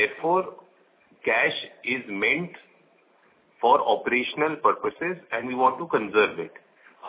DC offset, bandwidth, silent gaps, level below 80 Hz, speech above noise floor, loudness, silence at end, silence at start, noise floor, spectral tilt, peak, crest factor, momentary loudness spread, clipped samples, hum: under 0.1%; 4 kHz; none; -70 dBFS; 36 dB; -24 LUFS; 0 s; 0 s; -61 dBFS; -8 dB/octave; -6 dBFS; 20 dB; 9 LU; under 0.1%; none